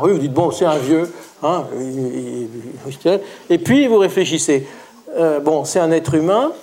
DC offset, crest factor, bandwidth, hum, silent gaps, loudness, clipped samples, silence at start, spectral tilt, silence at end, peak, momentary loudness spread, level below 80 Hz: under 0.1%; 16 dB; 16.5 kHz; none; none; -17 LUFS; under 0.1%; 0 s; -5 dB/octave; 0 s; -2 dBFS; 13 LU; -60 dBFS